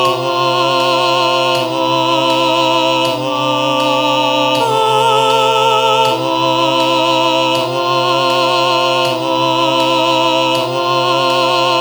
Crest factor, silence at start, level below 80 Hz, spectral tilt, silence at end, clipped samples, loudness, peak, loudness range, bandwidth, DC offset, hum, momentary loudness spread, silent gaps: 12 dB; 0 s; -66 dBFS; -3.5 dB/octave; 0 s; under 0.1%; -13 LUFS; 0 dBFS; 1 LU; over 20 kHz; under 0.1%; none; 3 LU; none